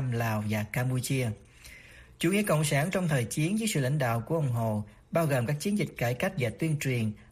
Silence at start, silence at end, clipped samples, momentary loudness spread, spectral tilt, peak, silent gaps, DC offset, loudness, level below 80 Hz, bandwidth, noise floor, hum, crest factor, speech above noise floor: 0 s; 0.05 s; under 0.1%; 6 LU; -5.5 dB/octave; -14 dBFS; none; under 0.1%; -29 LUFS; -58 dBFS; 15.5 kHz; -51 dBFS; none; 16 dB; 23 dB